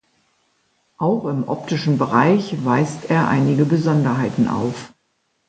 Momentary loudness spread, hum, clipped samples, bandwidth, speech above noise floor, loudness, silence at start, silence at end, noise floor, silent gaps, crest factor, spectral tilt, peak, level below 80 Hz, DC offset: 8 LU; none; under 0.1%; 9 kHz; 50 dB; -19 LUFS; 1 s; 0.6 s; -68 dBFS; none; 18 dB; -7.5 dB/octave; -2 dBFS; -56 dBFS; under 0.1%